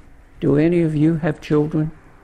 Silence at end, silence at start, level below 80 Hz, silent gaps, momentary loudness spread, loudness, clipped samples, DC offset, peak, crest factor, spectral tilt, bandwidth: 0.3 s; 0.4 s; -44 dBFS; none; 8 LU; -19 LUFS; under 0.1%; under 0.1%; -6 dBFS; 14 dB; -9 dB/octave; 9.4 kHz